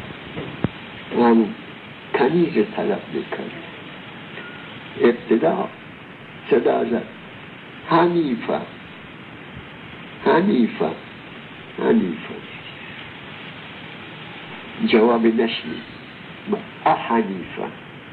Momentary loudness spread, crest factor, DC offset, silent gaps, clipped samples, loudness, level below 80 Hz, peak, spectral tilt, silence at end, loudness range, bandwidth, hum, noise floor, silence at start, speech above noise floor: 20 LU; 18 dB; under 0.1%; none; under 0.1%; -21 LUFS; -58 dBFS; -4 dBFS; -9 dB/octave; 0 s; 4 LU; 4.6 kHz; none; -39 dBFS; 0 s; 20 dB